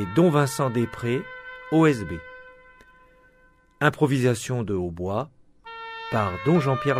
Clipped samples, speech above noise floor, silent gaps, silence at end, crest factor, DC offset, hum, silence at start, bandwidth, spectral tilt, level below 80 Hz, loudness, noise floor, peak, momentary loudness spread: under 0.1%; 36 dB; none; 0 s; 20 dB; under 0.1%; none; 0 s; 15.5 kHz; -6.5 dB/octave; -54 dBFS; -24 LUFS; -58 dBFS; -4 dBFS; 18 LU